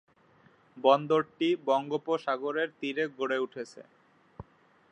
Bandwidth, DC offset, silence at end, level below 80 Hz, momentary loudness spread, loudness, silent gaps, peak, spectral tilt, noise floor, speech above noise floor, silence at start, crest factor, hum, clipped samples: 9 kHz; under 0.1%; 0.5 s; -70 dBFS; 11 LU; -29 LUFS; none; -10 dBFS; -5.5 dB/octave; -62 dBFS; 33 dB; 0.75 s; 22 dB; none; under 0.1%